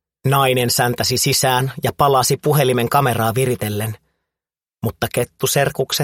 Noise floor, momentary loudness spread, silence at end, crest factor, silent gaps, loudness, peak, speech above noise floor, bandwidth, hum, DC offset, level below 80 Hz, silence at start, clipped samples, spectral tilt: -89 dBFS; 8 LU; 0 s; 16 dB; none; -17 LUFS; -2 dBFS; 72 dB; 17 kHz; none; under 0.1%; -48 dBFS; 0.25 s; under 0.1%; -4 dB/octave